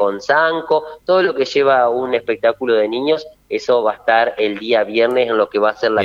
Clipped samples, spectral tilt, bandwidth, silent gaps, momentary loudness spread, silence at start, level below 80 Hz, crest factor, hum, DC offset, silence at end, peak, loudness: under 0.1%; -4.5 dB/octave; 7.6 kHz; none; 5 LU; 0 s; -60 dBFS; 16 dB; none; under 0.1%; 0 s; 0 dBFS; -16 LUFS